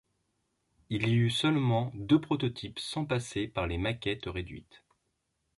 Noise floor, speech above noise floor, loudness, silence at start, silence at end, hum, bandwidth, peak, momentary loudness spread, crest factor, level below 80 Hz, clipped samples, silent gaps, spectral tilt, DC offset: -79 dBFS; 49 dB; -31 LUFS; 0.9 s; 0.95 s; none; 11.5 kHz; -12 dBFS; 11 LU; 20 dB; -52 dBFS; under 0.1%; none; -6 dB/octave; under 0.1%